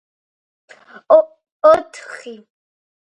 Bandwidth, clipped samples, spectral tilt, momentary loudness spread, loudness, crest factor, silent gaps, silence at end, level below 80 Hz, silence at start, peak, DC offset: 9 kHz; under 0.1%; -4 dB/octave; 20 LU; -14 LUFS; 18 dB; 1.52-1.60 s; 0.7 s; -62 dBFS; 1.1 s; 0 dBFS; under 0.1%